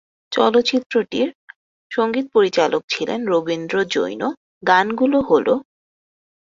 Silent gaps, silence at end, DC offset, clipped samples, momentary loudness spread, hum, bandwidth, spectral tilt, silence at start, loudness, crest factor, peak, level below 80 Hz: 0.86-0.90 s, 1.35-1.48 s, 1.56-1.90 s, 2.84-2.88 s, 4.37-4.61 s; 0.9 s; under 0.1%; under 0.1%; 9 LU; none; 7.6 kHz; -4.5 dB/octave; 0.3 s; -19 LUFS; 18 dB; -2 dBFS; -60 dBFS